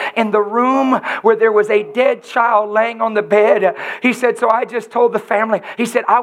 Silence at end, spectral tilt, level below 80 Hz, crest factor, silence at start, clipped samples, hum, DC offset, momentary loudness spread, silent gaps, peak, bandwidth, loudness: 0 s; -5 dB/octave; -76 dBFS; 14 dB; 0 s; under 0.1%; none; under 0.1%; 5 LU; none; 0 dBFS; 14 kHz; -15 LUFS